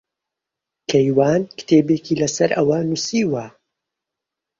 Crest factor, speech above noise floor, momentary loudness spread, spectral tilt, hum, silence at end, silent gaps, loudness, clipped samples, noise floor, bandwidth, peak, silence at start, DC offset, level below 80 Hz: 18 dB; 67 dB; 8 LU; -5.5 dB/octave; none; 1.1 s; none; -18 LUFS; under 0.1%; -84 dBFS; 7.8 kHz; -2 dBFS; 0.9 s; under 0.1%; -58 dBFS